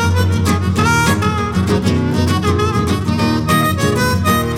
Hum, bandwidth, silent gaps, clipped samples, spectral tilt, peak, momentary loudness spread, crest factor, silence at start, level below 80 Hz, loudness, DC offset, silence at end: none; 17 kHz; none; under 0.1%; -5.5 dB/octave; -2 dBFS; 3 LU; 12 dB; 0 s; -32 dBFS; -15 LUFS; under 0.1%; 0 s